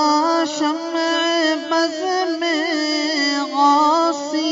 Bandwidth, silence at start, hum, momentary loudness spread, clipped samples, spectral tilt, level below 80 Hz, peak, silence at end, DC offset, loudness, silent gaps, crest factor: 7.8 kHz; 0 s; none; 6 LU; under 0.1%; -1 dB/octave; -70 dBFS; -4 dBFS; 0 s; under 0.1%; -18 LUFS; none; 16 dB